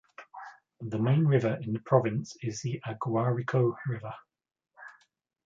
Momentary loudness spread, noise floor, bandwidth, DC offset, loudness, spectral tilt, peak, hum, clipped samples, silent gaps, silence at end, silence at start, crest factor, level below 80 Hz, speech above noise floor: 23 LU; -69 dBFS; 7.6 kHz; under 0.1%; -29 LUFS; -7.5 dB/octave; -8 dBFS; none; under 0.1%; none; 0.55 s; 0.2 s; 22 dB; -68 dBFS; 40 dB